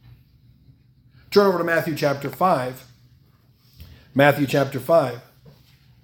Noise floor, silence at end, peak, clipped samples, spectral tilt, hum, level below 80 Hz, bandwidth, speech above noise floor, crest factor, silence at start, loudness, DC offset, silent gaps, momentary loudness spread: -56 dBFS; 0.85 s; 0 dBFS; under 0.1%; -6 dB/octave; none; -58 dBFS; 18 kHz; 37 dB; 22 dB; 1.3 s; -20 LUFS; under 0.1%; none; 11 LU